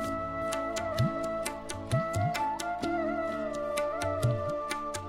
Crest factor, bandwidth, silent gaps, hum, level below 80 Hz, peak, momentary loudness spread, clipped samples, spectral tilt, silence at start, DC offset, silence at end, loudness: 18 dB; 16 kHz; none; none; -52 dBFS; -14 dBFS; 4 LU; under 0.1%; -5.5 dB/octave; 0 s; under 0.1%; 0 s; -32 LUFS